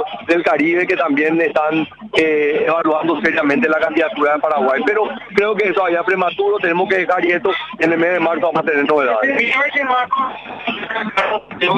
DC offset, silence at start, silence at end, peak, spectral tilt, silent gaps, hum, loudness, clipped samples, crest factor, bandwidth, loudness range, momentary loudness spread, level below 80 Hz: under 0.1%; 0 s; 0 s; -2 dBFS; -5.5 dB/octave; none; none; -16 LUFS; under 0.1%; 14 dB; 9.8 kHz; 1 LU; 5 LU; -58 dBFS